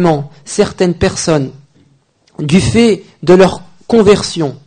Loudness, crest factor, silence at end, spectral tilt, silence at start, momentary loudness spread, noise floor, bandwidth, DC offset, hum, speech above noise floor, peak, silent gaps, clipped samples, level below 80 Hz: -12 LUFS; 12 dB; 0.1 s; -5.5 dB/octave; 0 s; 11 LU; -52 dBFS; 9.6 kHz; under 0.1%; none; 42 dB; 0 dBFS; none; 0.3%; -36 dBFS